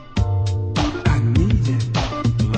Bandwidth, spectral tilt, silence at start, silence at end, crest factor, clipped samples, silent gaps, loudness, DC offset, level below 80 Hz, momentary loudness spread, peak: 8.8 kHz; -6.5 dB/octave; 0 s; 0 s; 14 dB; under 0.1%; none; -20 LUFS; under 0.1%; -28 dBFS; 4 LU; -4 dBFS